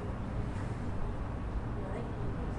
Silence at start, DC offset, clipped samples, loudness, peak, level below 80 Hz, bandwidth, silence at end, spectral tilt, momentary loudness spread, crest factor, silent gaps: 0 s; under 0.1%; under 0.1%; -39 LUFS; -22 dBFS; -40 dBFS; 11 kHz; 0 s; -8 dB/octave; 1 LU; 14 dB; none